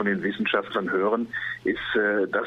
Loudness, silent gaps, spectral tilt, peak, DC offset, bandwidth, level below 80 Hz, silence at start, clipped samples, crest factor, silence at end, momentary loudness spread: -25 LUFS; none; -7 dB/octave; -10 dBFS; under 0.1%; 7.4 kHz; -60 dBFS; 0 s; under 0.1%; 16 dB; 0 s; 5 LU